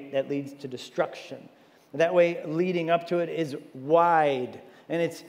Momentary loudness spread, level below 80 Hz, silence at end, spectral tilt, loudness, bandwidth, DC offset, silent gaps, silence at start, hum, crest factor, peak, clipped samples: 18 LU; -84 dBFS; 0 s; -6.5 dB/octave; -26 LUFS; 15.5 kHz; under 0.1%; none; 0 s; none; 18 dB; -8 dBFS; under 0.1%